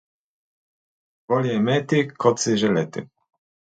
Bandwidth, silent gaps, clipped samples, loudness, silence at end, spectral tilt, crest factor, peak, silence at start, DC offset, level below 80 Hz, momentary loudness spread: 9.2 kHz; none; under 0.1%; -21 LUFS; 0.65 s; -5 dB/octave; 20 dB; -4 dBFS; 1.3 s; under 0.1%; -64 dBFS; 6 LU